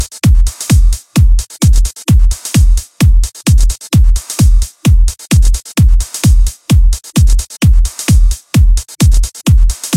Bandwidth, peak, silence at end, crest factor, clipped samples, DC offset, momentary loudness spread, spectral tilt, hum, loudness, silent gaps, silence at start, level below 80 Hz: 15.5 kHz; 0 dBFS; 0 s; 8 dB; under 0.1%; under 0.1%; 2 LU; -5 dB/octave; none; -12 LUFS; none; 0 s; -10 dBFS